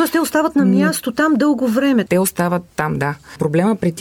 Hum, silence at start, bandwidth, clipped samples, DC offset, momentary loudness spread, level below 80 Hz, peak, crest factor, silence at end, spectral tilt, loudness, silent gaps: none; 0 s; 18.5 kHz; under 0.1%; under 0.1%; 7 LU; -52 dBFS; -2 dBFS; 14 dB; 0 s; -5.5 dB/octave; -17 LUFS; none